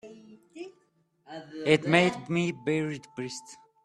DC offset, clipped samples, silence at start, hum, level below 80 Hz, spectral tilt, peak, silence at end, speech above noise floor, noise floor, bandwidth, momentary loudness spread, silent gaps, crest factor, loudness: under 0.1%; under 0.1%; 0.05 s; none; -68 dBFS; -5.5 dB/octave; -6 dBFS; 0.3 s; 42 dB; -69 dBFS; 11.5 kHz; 22 LU; none; 24 dB; -27 LUFS